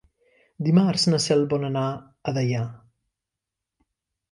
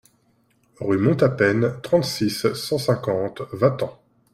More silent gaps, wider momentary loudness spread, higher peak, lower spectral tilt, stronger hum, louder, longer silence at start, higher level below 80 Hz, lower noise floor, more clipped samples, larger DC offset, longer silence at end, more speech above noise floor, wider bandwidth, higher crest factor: neither; about the same, 10 LU vs 10 LU; second, -8 dBFS vs -4 dBFS; about the same, -6 dB/octave vs -6 dB/octave; neither; about the same, -23 LUFS vs -22 LUFS; second, 0.6 s vs 0.8 s; second, -64 dBFS vs -56 dBFS; first, -86 dBFS vs -63 dBFS; neither; neither; first, 1.55 s vs 0.4 s; first, 64 dB vs 42 dB; second, 11.5 kHz vs 16 kHz; about the same, 18 dB vs 18 dB